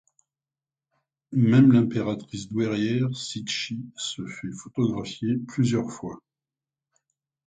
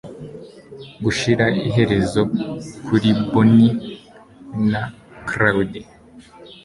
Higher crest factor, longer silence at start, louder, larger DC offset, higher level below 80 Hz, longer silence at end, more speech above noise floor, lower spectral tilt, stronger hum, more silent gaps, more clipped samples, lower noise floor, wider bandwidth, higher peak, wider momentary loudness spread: about the same, 20 dB vs 18 dB; first, 1.3 s vs 0.05 s; second, -25 LUFS vs -18 LUFS; neither; second, -62 dBFS vs -46 dBFS; first, 1.25 s vs 0.1 s; first, over 66 dB vs 27 dB; about the same, -6 dB/octave vs -6.5 dB/octave; neither; neither; neither; first, under -90 dBFS vs -44 dBFS; second, 9.4 kHz vs 11.5 kHz; second, -6 dBFS vs -2 dBFS; second, 16 LU vs 22 LU